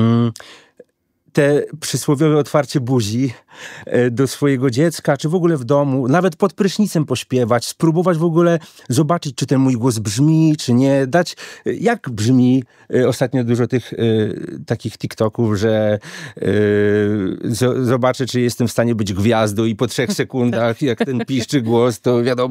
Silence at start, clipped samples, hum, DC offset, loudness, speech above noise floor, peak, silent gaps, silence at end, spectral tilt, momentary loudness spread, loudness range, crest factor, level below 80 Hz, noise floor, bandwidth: 0 s; under 0.1%; none; under 0.1%; -17 LUFS; 44 dB; -2 dBFS; none; 0 s; -6 dB/octave; 7 LU; 2 LU; 16 dB; -58 dBFS; -61 dBFS; 16 kHz